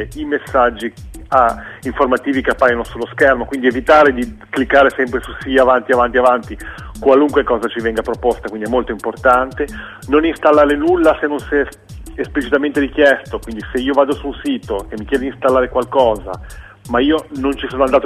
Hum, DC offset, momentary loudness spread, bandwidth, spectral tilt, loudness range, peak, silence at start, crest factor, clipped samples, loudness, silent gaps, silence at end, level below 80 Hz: none; under 0.1%; 12 LU; 14.5 kHz; -5.5 dB/octave; 4 LU; 0 dBFS; 0 s; 16 dB; under 0.1%; -15 LUFS; none; 0 s; -36 dBFS